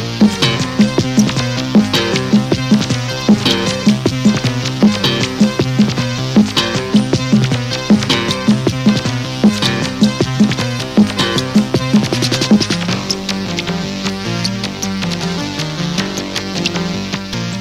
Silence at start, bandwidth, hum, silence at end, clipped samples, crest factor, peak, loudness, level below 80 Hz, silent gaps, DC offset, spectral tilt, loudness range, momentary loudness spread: 0 s; 15 kHz; none; 0 s; under 0.1%; 14 dB; 0 dBFS; -15 LUFS; -40 dBFS; none; under 0.1%; -5 dB/octave; 5 LU; 7 LU